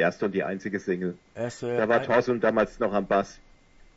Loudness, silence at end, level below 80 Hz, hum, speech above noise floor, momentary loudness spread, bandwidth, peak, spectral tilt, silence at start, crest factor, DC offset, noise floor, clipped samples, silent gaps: -26 LUFS; 0.6 s; -56 dBFS; none; 29 dB; 11 LU; 8 kHz; -8 dBFS; -6.5 dB/octave; 0 s; 18 dB; under 0.1%; -54 dBFS; under 0.1%; none